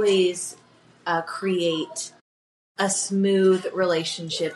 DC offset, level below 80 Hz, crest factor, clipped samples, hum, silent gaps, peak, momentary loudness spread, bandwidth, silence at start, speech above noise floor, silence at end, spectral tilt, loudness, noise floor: under 0.1%; -78 dBFS; 16 dB; under 0.1%; none; 2.21-2.75 s; -8 dBFS; 14 LU; 12 kHz; 0 s; over 67 dB; 0 s; -4 dB/octave; -24 LUFS; under -90 dBFS